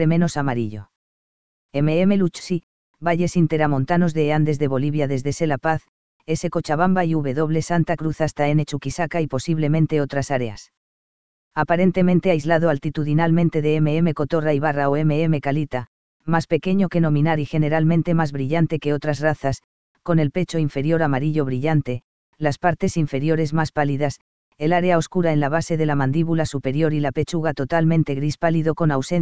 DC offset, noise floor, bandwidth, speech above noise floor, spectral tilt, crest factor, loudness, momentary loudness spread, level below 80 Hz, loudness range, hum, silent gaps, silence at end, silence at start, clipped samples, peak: 2%; under -90 dBFS; 8 kHz; over 70 dB; -7.5 dB/octave; 18 dB; -21 LUFS; 7 LU; -48 dBFS; 3 LU; none; 0.96-1.69 s, 2.63-2.94 s, 5.88-6.20 s, 10.77-11.51 s, 15.87-16.20 s, 19.64-19.95 s, 22.04-22.33 s, 24.21-24.52 s; 0 s; 0 s; under 0.1%; -2 dBFS